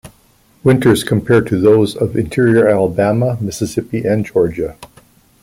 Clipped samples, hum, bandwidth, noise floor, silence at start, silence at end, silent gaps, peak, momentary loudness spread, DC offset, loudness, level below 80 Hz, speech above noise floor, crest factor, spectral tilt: under 0.1%; none; 16.5 kHz; -52 dBFS; 0.05 s; 0.6 s; none; -2 dBFS; 8 LU; under 0.1%; -14 LUFS; -44 dBFS; 38 dB; 12 dB; -6.5 dB/octave